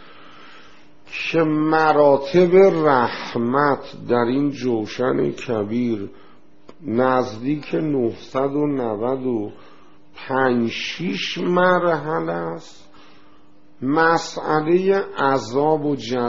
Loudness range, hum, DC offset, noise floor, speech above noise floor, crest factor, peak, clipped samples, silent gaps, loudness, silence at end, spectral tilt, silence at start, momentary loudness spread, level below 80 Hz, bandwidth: 6 LU; none; 0.8%; -53 dBFS; 34 dB; 18 dB; -2 dBFS; under 0.1%; none; -20 LUFS; 0 s; -4.5 dB/octave; 0.4 s; 10 LU; -58 dBFS; 7.4 kHz